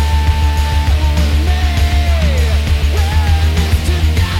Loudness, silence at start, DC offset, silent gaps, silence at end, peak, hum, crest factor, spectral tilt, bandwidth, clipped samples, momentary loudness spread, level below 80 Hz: -14 LUFS; 0 s; under 0.1%; none; 0 s; -2 dBFS; none; 10 dB; -5.5 dB/octave; 15 kHz; under 0.1%; 1 LU; -14 dBFS